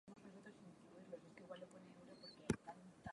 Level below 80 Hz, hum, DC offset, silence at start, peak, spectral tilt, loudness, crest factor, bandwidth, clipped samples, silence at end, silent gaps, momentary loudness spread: -72 dBFS; none; under 0.1%; 0.05 s; -24 dBFS; -5.5 dB/octave; -54 LUFS; 30 dB; 11 kHz; under 0.1%; 0 s; none; 16 LU